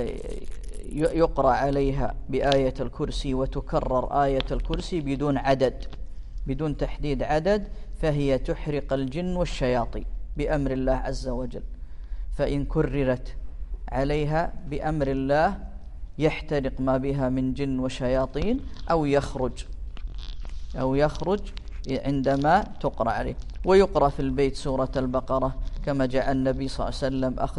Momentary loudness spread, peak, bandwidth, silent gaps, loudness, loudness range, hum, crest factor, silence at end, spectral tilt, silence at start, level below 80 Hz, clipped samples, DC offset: 17 LU; -4 dBFS; 11.5 kHz; none; -26 LUFS; 4 LU; none; 20 dB; 0 s; -7 dB/octave; 0 s; -34 dBFS; under 0.1%; under 0.1%